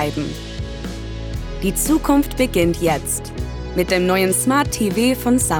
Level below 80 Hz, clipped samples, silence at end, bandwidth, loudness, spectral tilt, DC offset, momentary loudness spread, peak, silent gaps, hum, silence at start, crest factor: -32 dBFS; under 0.1%; 0 s; over 20 kHz; -19 LUFS; -4.5 dB/octave; under 0.1%; 13 LU; -4 dBFS; none; none; 0 s; 16 dB